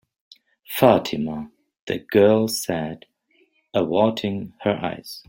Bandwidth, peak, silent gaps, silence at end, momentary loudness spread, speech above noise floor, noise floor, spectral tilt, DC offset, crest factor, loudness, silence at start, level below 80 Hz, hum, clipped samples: 16.5 kHz; -2 dBFS; 1.79-1.87 s; 0.1 s; 16 LU; 42 dB; -63 dBFS; -5.5 dB/octave; under 0.1%; 22 dB; -21 LUFS; 0.7 s; -60 dBFS; none; under 0.1%